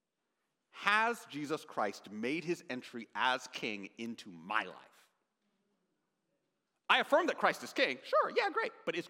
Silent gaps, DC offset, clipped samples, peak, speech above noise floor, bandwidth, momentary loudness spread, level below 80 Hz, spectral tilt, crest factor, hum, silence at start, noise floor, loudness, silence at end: none; under 0.1%; under 0.1%; -12 dBFS; 51 dB; 16.5 kHz; 14 LU; under -90 dBFS; -3.5 dB/octave; 26 dB; none; 0.75 s; -86 dBFS; -34 LUFS; 0 s